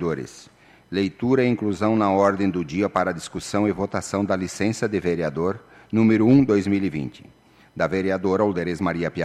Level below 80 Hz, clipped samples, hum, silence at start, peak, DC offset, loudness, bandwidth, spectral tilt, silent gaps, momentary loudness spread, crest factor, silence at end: -54 dBFS; under 0.1%; none; 0 s; -6 dBFS; under 0.1%; -22 LUFS; 12.5 kHz; -6.5 dB/octave; none; 10 LU; 16 dB; 0 s